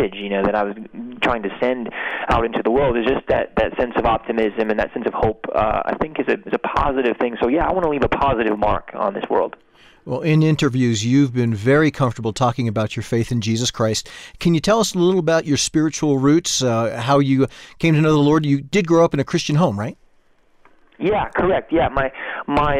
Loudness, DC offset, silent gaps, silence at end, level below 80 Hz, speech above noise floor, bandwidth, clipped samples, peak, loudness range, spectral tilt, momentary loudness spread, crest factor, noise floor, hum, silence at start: -19 LUFS; under 0.1%; none; 0 s; -38 dBFS; 36 dB; 14.5 kHz; under 0.1%; -6 dBFS; 3 LU; -5.5 dB/octave; 7 LU; 12 dB; -55 dBFS; none; 0 s